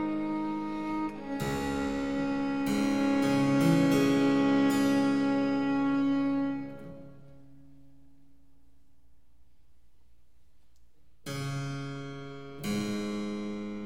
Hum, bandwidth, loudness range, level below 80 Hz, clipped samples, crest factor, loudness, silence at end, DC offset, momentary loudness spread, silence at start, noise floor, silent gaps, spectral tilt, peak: none; 16 kHz; 16 LU; -58 dBFS; under 0.1%; 16 dB; -29 LUFS; 0 s; 0.3%; 15 LU; 0 s; -65 dBFS; none; -6 dB/octave; -14 dBFS